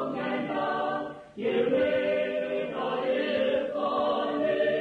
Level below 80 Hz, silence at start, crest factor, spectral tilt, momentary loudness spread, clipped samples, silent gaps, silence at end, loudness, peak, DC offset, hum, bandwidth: -66 dBFS; 0 s; 12 dB; -6.5 dB/octave; 6 LU; under 0.1%; none; 0 s; -28 LUFS; -16 dBFS; under 0.1%; none; 6.6 kHz